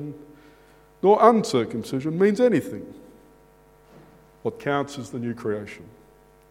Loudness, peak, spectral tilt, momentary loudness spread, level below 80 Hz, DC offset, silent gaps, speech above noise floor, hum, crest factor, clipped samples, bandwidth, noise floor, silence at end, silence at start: -23 LUFS; 0 dBFS; -6.5 dB/octave; 21 LU; -62 dBFS; under 0.1%; none; 32 dB; none; 24 dB; under 0.1%; 15.5 kHz; -54 dBFS; 0.65 s; 0 s